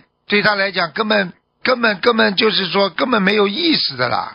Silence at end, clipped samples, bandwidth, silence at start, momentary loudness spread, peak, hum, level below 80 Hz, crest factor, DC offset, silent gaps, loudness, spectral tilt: 0 s; under 0.1%; 6.2 kHz; 0.3 s; 5 LU; 0 dBFS; none; -60 dBFS; 16 dB; under 0.1%; none; -16 LUFS; -7 dB/octave